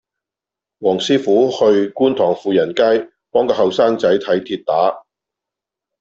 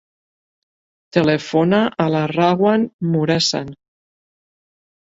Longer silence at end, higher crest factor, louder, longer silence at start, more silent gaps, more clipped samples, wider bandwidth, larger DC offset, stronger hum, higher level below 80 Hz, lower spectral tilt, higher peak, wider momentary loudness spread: second, 1 s vs 1.4 s; about the same, 14 dB vs 18 dB; about the same, -16 LUFS vs -17 LUFS; second, 0.8 s vs 1.15 s; second, none vs 2.93-2.99 s; neither; about the same, 7.8 kHz vs 7.8 kHz; neither; neither; about the same, -60 dBFS vs -56 dBFS; about the same, -5.5 dB/octave vs -5.5 dB/octave; about the same, -2 dBFS vs 0 dBFS; about the same, 6 LU vs 5 LU